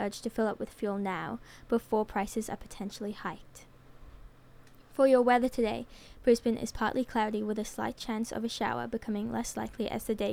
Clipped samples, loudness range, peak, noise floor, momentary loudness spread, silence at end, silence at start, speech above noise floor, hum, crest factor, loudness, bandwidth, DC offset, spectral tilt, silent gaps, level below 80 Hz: under 0.1%; 7 LU; -12 dBFS; -54 dBFS; 14 LU; 0 s; 0 s; 23 dB; none; 20 dB; -32 LUFS; 17.5 kHz; under 0.1%; -5 dB/octave; none; -54 dBFS